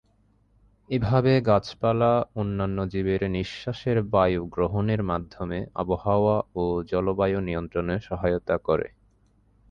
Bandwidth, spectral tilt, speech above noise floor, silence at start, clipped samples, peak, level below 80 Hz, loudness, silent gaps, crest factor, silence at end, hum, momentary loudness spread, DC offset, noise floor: 7.2 kHz; -8.5 dB/octave; 39 dB; 0.9 s; under 0.1%; -8 dBFS; -44 dBFS; -25 LUFS; none; 18 dB; 0.85 s; none; 9 LU; under 0.1%; -63 dBFS